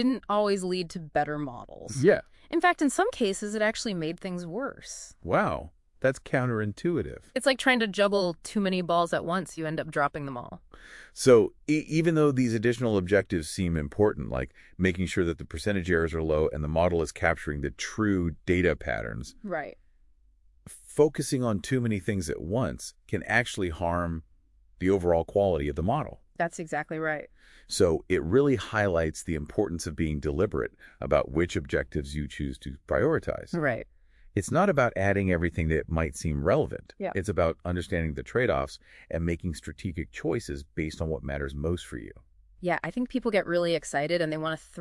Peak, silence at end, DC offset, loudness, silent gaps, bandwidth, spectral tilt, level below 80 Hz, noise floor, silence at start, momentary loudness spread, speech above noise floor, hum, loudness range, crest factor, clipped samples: -8 dBFS; 0 s; under 0.1%; -28 LUFS; none; 12 kHz; -5.5 dB/octave; -46 dBFS; -61 dBFS; 0 s; 11 LU; 33 dB; none; 4 LU; 20 dB; under 0.1%